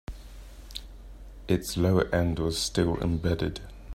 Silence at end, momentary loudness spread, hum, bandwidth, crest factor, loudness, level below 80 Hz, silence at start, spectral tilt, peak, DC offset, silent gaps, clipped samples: 0 s; 23 LU; none; 16 kHz; 20 dB; -27 LUFS; -42 dBFS; 0.1 s; -5.5 dB/octave; -10 dBFS; under 0.1%; none; under 0.1%